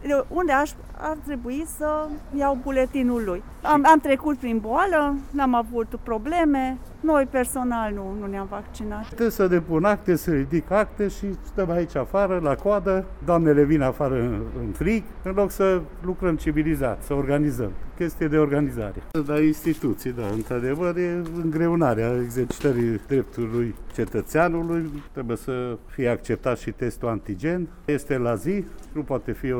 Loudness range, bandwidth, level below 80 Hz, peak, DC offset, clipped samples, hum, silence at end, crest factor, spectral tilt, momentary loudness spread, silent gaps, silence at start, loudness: 5 LU; 19 kHz; -38 dBFS; -4 dBFS; under 0.1%; under 0.1%; none; 0 s; 18 dB; -7 dB/octave; 9 LU; none; 0 s; -24 LUFS